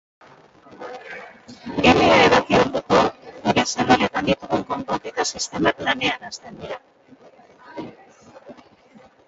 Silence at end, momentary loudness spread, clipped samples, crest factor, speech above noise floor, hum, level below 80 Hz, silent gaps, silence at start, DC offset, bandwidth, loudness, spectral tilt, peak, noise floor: 0.75 s; 22 LU; under 0.1%; 22 dB; 29 dB; none; -48 dBFS; none; 0.8 s; under 0.1%; 8 kHz; -19 LUFS; -4 dB/octave; 0 dBFS; -51 dBFS